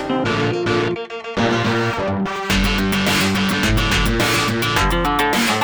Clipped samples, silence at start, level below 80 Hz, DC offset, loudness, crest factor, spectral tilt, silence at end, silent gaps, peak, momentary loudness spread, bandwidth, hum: under 0.1%; 0 s; -28 dBFS; under 0.1%; -18 LUFS; 14 dB; -4.5 dB/octave; 0 s; none; -4 dBFS; 5 LU; over 20 kHz; none